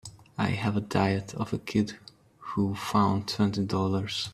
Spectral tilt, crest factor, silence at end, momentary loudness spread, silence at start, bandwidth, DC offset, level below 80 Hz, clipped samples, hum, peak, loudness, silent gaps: -6 dB/octave; 20 dB; 0 s; 8 LU; 0.05 s; 13.5 kHz; under 0.1%; -60 dBFS; under 0.1%; none; -8 dBFS; -28 LUFS; none